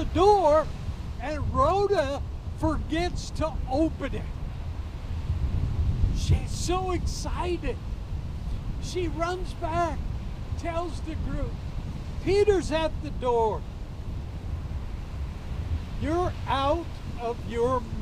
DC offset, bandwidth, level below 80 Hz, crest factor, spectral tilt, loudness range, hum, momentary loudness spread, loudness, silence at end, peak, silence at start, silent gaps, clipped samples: under 0.1%; 13.5 kHz; -34 dBFS; 18 dB; -6.5 dB/octave; 4 LU; none; 13 LU; -29 LUFS; 0 s; -8 dBFS; 0 s; none; under 0.1%